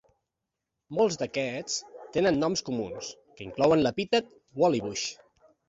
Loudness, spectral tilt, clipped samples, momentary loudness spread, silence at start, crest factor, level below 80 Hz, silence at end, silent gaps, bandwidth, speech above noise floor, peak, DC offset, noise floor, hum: -28 LUFS; -4.5 dB/octave; under 0.1%; 14 LU; 0.9 s; 20 dB; -62 dBFS; 0.55 s; none; 8 kHz; 59 dB; -10 dBFS; under 0.1%; -86 dBFS; none